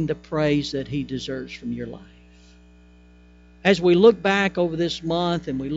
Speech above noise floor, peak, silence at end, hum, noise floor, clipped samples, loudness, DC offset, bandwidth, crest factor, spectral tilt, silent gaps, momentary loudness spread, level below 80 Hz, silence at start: 29 dB; -4 dBFS; 0 s; 60 Hz at -45 dBFS; -50 dBFS; under 0.1%; -22 LUFS; under 0.1%; 8 kHz; 20 dB; -6 dB/octave; none; 16 LU; -50 dBFS; 0 s